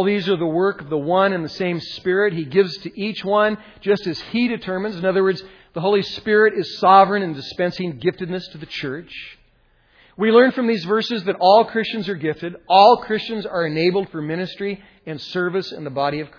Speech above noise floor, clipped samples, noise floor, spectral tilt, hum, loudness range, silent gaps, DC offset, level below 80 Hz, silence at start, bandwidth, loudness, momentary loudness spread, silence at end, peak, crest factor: 39 dB; under 0.1%; -58 dBFS; -6.5 dB/octave; none; 4 LU; none; under 0.1%; -58 dBFS; 0 s; 5.4 kHz; -19 LUFS; 14 LU; 0.1 s; 0 dBFS; 20 dB